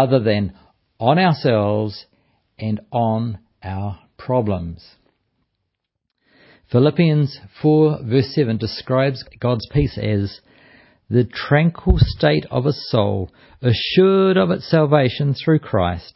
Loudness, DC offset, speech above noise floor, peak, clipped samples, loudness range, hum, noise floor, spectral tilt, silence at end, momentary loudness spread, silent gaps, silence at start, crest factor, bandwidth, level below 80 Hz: -19 LUFS; under 0.1%; 59 dB; 0 dBFS; under 0.1%; 7 LU; none; -77 dBFS; -11 dB/octave; 0.15 s; 13 LU; none; 0 s; 18 dB; 5.8 kHz; -34 dBFS